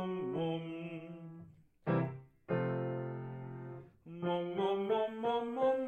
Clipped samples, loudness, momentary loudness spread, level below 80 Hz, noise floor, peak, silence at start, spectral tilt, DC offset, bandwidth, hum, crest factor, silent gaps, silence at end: under 0.1%; -37 LUFS; 16 LU; -72 dBFS; -57 dBFS; -20 dBFS; 0 s; -9 dB/octave; under 0.1%; 8.2 kHz; none; 16 dB; none; 0 s